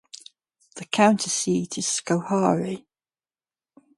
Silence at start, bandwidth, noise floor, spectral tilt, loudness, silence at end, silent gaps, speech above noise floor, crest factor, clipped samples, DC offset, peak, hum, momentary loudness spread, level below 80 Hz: 0.15 s; 11.5 kHz; under -90 dBFS; -4 dB/octave; -23 LUFS; 1.2 s; none; over 67 dB; 22 dB; under 0.1%; under 0.1%; -4 dBFS; none; 23 LU; -68 dBFS